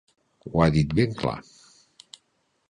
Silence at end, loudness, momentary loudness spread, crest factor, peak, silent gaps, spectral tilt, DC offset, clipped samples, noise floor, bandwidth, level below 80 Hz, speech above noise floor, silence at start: 1.3 s; -24 LUFS; 16 LU; 22 dB; -6 dBFS; none; -7.5 dB/octave; under 0.1%; under 0.1%; -72 dBFS; 10 kHz; -44 dBFS; 49 dB; 0.45 s